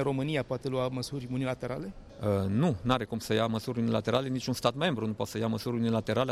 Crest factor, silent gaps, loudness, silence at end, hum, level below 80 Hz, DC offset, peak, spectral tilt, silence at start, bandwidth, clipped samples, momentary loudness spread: 18 dB; none; -31 LUFS; 0 s; none; -56 dBFS; under 0.1%; -12 dBFS; -6 dB/octave; 0 s; 15.5 kHz; under 0.1%; 7 LU